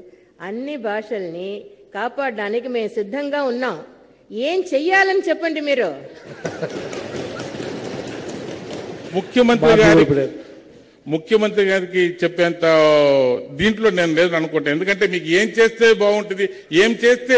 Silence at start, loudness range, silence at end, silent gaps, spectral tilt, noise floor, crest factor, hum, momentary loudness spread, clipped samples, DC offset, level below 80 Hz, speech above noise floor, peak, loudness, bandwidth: 0.4 s; 9 LU; 0 s; none; -5 dB/octave; -45 dBFS; 12 dB; none; 17 LU; under 0.1%; under 0.1%; -50 dBFS; 28 dB; -6 dBFS; -18 LUFS; 8 kHz